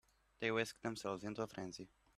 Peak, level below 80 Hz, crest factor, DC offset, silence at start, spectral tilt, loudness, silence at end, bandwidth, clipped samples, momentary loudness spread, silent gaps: -22 dBFS; -74 dBFS; 22 dB; under 0.1%; 0.4 s; -4.5 dB/octave; -43 LUFS; 0.3 s; 14.5 kHz; under 0.1%; 11 LU; none